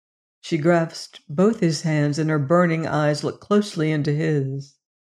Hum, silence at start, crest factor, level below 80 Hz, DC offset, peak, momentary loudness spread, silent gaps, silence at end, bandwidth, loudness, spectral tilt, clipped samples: none; 0.45 s; 16 dB; -64 dBFS; under 0.1%; -4 dBFS; 11 LU; none; 0.35 s; 11 kHz; -21 LUFS; -6.5 dB/octave; under 0.1%